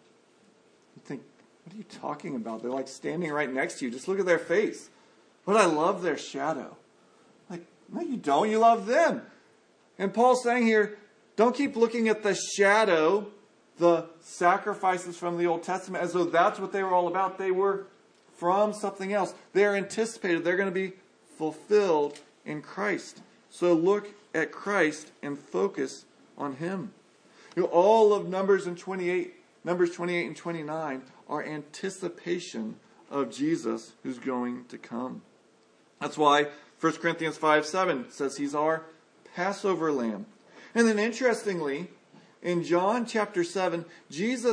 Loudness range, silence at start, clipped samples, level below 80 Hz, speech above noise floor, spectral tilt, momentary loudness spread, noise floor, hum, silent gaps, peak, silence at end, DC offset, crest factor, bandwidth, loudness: 8 LU; 0.95 s; under 0.1%; -86 dBFS; 35 dB; -5 dB/octave; 15 LU; -62 dBFS; none; none; -6 dBFS; 0 s; under 0.1%; 22 dB; 10.5 kHz; -27 LUFS